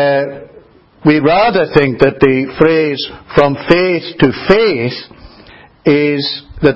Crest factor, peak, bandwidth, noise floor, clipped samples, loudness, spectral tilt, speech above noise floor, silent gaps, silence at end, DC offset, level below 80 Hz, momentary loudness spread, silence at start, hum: 12 dB; 0 dBFS; 8 kHz; -42 dBFS; 0.3%; -12 LUFS; -8 dB/octave; 31 dB; none; 0 s; under 0.1%; -40 dBFS; 9 LU; 0 s; none